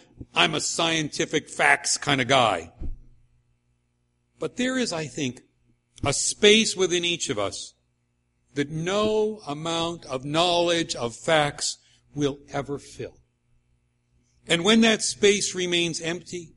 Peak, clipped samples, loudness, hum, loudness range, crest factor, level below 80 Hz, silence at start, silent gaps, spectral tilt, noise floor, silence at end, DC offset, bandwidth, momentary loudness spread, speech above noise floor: -2 dBFS; under 0.1%; -23 LUFS; 60 Hz at -55 dBFS; 6 LU; 24 dB; -50 dBFS; 0.2 s; none; -3 dB/octave; -71 dBFS; 0.1 s; under 0.1%; 11.5 kHz; 16 LU; 47 dB